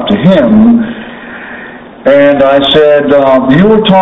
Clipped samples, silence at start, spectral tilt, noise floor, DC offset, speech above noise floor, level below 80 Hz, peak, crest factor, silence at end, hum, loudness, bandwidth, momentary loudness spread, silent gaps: 3%; 0 s; -8 dB/octave; -27 dBFS; under 0.1%; 22 dB; -36 dBFS; 0 dBFS; 6 dB; 0 s; none; -6 LUFS; 6 kHz; 19 LU; none